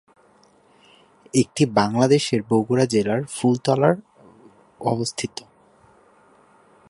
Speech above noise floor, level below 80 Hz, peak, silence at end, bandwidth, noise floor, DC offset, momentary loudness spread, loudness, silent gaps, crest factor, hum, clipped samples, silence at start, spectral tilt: 36 dB; -60 dBFS; -2 dBFS; 1.6 s; 11.5 kHz; -56 dBFS; under 0.1%; 10 LU; -21 LUFS; none; 20 dB; none; under 0.1%; 1.35 s; -5.5 dB/octave